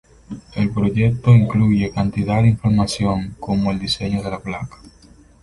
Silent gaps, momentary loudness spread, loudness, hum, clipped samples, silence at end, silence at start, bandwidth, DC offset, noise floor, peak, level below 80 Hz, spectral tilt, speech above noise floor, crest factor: none; 16 LU; -18 LUFS; none; under 0.1%; 0.75 s; 0.3 s; 11.5 kHz; under 0.1%; -48 dBFS; -2 dBFS; -38 dBFS; -7 dB/octave; 30 dB; 16 dB